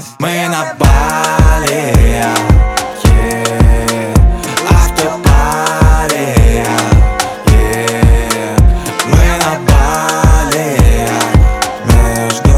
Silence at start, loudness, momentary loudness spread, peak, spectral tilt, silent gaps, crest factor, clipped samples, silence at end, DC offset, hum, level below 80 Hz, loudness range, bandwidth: 0 s; -11 LUFS; 4 LU; 0 dBFS; -5 dB/octave; none; 10 dB; under 0.1%; 0 s; 0.2%; none; -12 dBFS; 1 LU; 15.5 kHz